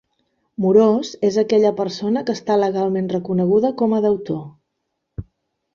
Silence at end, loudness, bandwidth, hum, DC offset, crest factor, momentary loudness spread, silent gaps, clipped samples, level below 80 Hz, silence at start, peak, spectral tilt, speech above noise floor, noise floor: 0.55 s; -18 LUFS; 7.4 kHz; none; under 0.1%; 18 dB; 17 LU; none; under 0.1%; -52 dBFS; 0.6 s; -2 dBFS; -7 dB/octave; 58 dB; -76 dBFS